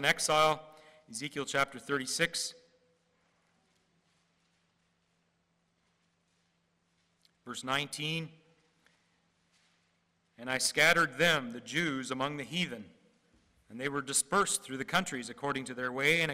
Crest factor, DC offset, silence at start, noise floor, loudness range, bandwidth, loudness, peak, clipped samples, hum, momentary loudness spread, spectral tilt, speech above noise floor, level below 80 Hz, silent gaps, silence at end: 20 dB; under 0.1%; 0 s; -76 dBFS; 10 LU; 16 kHz; -31 LUFS; -16 dBFS; under 0.1%; none; 13 LU; -2.5 dB/octave; 44 dB; -70 dBFS; none; 0 s